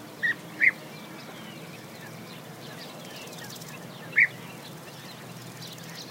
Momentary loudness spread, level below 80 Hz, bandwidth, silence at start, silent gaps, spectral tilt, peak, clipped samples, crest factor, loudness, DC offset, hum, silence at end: 19 LU; -76 dBFS; 16 kHz; 0 s; none; -3 dB/octave; -8 dBFS; under 0.1%; 24 dB; -27 LUFS; under 0.1%; none; 0 s